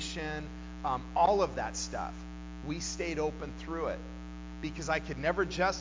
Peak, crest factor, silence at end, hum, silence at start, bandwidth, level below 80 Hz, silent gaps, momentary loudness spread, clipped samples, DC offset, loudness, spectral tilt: -14 dBFS; 18 dB; 0 s; none; 0 s; 7.6 kHz; -46 dBFS; none; 15 LU; under 0.1%; under 0.1%; -34 LUFS; -4.5 dB/octave